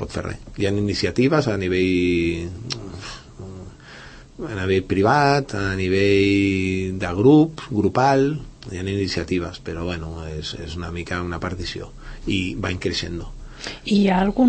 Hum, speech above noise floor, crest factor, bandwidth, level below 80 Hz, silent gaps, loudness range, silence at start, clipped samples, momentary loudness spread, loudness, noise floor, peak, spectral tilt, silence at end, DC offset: none; 21 dB; 18 dB; 8.8 kHz; -40 dBFS; none; 9 LU; 0 s; under 0.1%; 18 LU; -21 LUFS; -41 dBFS; -4 dBFS; -6 dB/octave; 0 s; under 0.1%